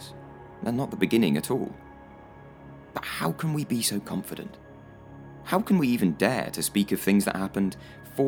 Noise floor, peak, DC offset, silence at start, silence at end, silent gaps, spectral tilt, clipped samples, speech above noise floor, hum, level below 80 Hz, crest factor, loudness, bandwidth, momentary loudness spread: -47 dBFS; -6 dBFS; under 0.1%; 0 s; 0 s; none; -5 dB/octave; under 0.1%; 21 dB; none; -58 dBFS; 20 dB; -27 LUFS; over 20 kHz; 24 LU